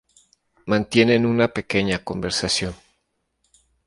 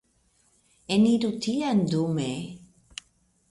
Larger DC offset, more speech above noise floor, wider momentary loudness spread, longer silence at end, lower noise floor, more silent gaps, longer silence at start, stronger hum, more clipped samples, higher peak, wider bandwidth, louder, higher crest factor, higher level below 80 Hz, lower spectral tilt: neither; first, 52 dB vs 42 dB; second, 8 LU vs 21 LU; first, 1.1 s vs 0.95 s; first, -73 dBFS vs -67 dBFS; neither; second, 0.65 s vs 0.9 s; neither; neither; first, -4 dBFS vs -12 dBFS; about the same, 11.5 kHz vs 11.5 kHz; first, -21 LUFS vs -25 LUFS; about the same, 20 dB vs 16 dB; first, -48 dBFS vs -62 dBFS; second, -4.5 dB/octave vs -6 dB/octave